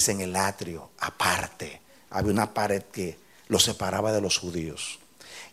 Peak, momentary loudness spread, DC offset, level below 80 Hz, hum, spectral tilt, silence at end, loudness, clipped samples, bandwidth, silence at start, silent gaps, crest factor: -4 dBFS; 15 LU; under 0.1%; -56 dBFS; none; -3 dB/octave; 0.05 s; -27 LUFS; under 0.1%; 16 kHz; 0 s; none; 24 dB